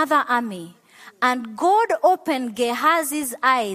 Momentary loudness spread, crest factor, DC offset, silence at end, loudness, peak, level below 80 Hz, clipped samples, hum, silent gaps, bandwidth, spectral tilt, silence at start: 7 LU; 16 dB; under 0.1%; 0 s; -20 LUFS; -4 dBFS; -72 dBFS; under 0.1%; none; none; 15 kHz; -2.5 dB/octave; 0 s